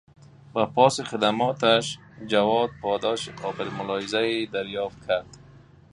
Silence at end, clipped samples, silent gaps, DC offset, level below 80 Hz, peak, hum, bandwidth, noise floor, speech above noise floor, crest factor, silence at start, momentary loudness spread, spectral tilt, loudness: 0.35 s; under 0.1%; none; under 0.1%; -60 dBFS; -4 dBFS; none; 11.5 kHz; -51 dBFS; 26 dB; 22 dB; 0.55 s; 11 LU; -4.5 dB/octave; -25 LUFS